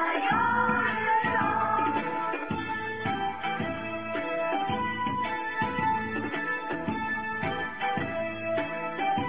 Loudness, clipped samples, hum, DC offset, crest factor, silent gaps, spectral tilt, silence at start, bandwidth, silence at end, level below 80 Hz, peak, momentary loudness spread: -29 LUFS; under 0.1%; none; 0.4%; 14 dB; none; -3 dB/octave; 0 s; 4 kHz; 0 s; -56 dBFS; -14 dBFS; 7 LU